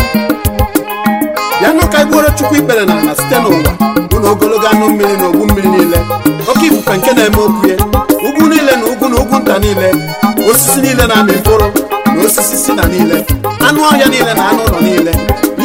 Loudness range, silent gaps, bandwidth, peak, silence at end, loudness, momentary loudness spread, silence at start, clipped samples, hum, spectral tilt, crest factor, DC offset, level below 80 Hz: 1 LU; none; 17 kHz; 0 dBFS; 0 s; -9 LUFS; 5 LU; 0 s; 0.5%; none; -4.5 dB/octave; 10 dB; under 0.1%; -24 dBFS